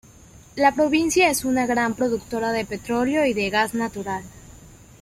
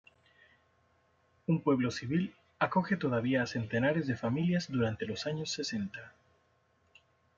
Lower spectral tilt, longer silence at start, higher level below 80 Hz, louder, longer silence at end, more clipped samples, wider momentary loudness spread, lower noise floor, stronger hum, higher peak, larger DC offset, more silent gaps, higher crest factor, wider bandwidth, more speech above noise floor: second, -3.5 dB/octave vs -6 dB/octave; second, 0.35 s vs 1.5 s; first, -50 dBFS vs -70 dBFS; first, -22 LUFS vs -33 LUFS; second, 0.25 s vs 1.3 s; neither; about the same, 9 LU vs 7 LU; second, -48 dBFS vs -71 dBFS; neither; first, -4 dBFS vs -12 dBFS; neither; neither; about the same, 18 dB vs 22 dB; first, 16 kHz vs 7.6 kHz; second, 26 dB vs 40 dB